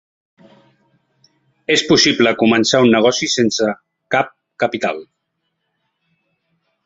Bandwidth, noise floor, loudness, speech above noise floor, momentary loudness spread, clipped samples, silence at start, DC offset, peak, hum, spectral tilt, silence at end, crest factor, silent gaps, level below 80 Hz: 8 kHz; -73 dBFS; -15 LUFS; 58 dB; 12 LU; under 0.1%; 1.7 s; under 0.1%; 0 dBFS; none; -3.5 dB/octave; 1.8 s; 18 dB; none; -58 dBFS